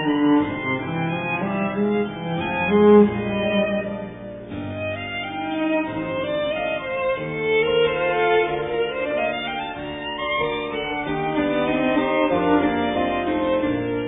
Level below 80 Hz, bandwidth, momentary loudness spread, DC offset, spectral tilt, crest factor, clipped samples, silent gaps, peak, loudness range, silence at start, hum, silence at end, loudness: -48 dBFS; 3.9 kHz; 9 LU; under 0.1%; -10 dB/octave; 18 dB; under 0.1%; none; -4 dBFS; 5 LU; 0 s; none; 0 s; -22 LUFS